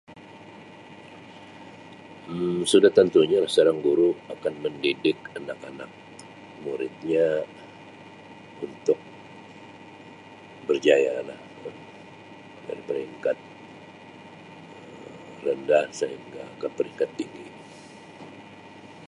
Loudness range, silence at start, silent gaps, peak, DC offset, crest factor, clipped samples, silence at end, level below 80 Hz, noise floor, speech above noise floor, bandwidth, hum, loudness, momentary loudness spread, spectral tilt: 13 LU; 0.1 s; none; -4 dBFS; under 0.1%; 24 dB; under 0.1%; 0 s; -70 dBFS; -46 dBFS; 22 dB; 11.5 kHz; none; -24 LUFS; 25 LU; -5 dB/octave